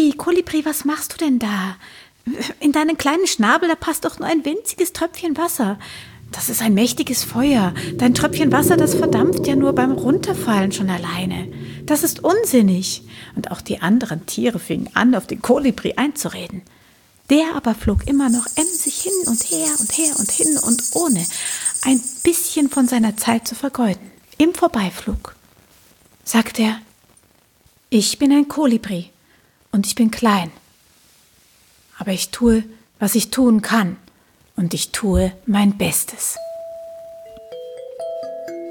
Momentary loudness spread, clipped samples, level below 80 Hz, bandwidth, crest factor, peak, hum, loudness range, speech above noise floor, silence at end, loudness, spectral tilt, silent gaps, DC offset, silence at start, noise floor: 15 LU; under 0.1%; -40 dBFS; 18 kHz; 18 dB; -2 dBFS; none; 5 LU; 38 dB; 0 s; -18 LUFS; -4 dB/octave; none; under 0.1%; 0 s; -56 dBFS